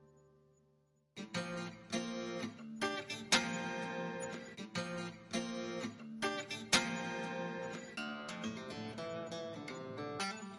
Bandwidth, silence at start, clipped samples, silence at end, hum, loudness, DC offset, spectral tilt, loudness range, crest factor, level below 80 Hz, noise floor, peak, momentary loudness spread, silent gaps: 11.5 kHz; 0 s; under 0.1%; 0 s; none; -40 LUFS; under 0.1%; -3 dB/octave; 5 LU; 28 dB; -76 dBFS; -74 dBFS; -14 dBFS; 13 LU; none